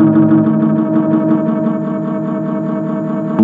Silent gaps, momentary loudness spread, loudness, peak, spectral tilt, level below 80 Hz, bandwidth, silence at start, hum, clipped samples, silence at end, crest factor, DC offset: none; 8 LU; -14 LUFS; 0 dBFS; -11.5 dB/octave; -58 dBFS; 3.7 kHz; 0 s; none; under 0.1%; 0 s; 12 dB; under 0.1%